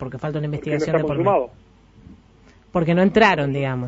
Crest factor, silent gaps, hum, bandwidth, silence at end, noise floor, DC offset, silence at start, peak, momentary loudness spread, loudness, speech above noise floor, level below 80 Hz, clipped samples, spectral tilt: 18 dB; none; none; 8 kHz; 0 s; -51 dBFS; under 0.1%; 0 s; -2 dBFS; 11 LU; -20 LUFS; 31 dB; -48 dBFS; under 0.1%; -7 dB/octave